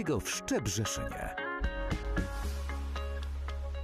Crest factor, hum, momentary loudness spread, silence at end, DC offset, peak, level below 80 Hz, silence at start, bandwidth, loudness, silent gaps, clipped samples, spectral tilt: 14 dB; none; 6 LU; 0 s; under 0.1%; -20 dBFS; -38 dBFS; 0 s; 14.5 kHz; -36 LUFS; none; under 0.1%; -4.5 dB/octave